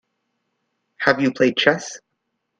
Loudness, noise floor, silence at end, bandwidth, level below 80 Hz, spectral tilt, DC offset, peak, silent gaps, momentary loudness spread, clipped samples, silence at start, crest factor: -19 LUFS; -76 dBFS; 0.6 s; 9.4 kHz; -62 dBFS; -4 dB/octave; under 0.1%; 0 dBFS; none; 16 LU; under 0.1%; 1 s; 22 dB